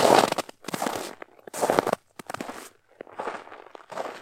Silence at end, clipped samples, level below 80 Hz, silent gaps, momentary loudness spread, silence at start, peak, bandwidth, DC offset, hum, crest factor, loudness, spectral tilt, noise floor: 0 s; under 0.1%; -70 dBFS; none; 21 LU; 0 s; 0 dBFS; 17 kHz; under 0.1%; none; 26 dB; -28 LUFS; -3.5 dB/octave; -48 dBFS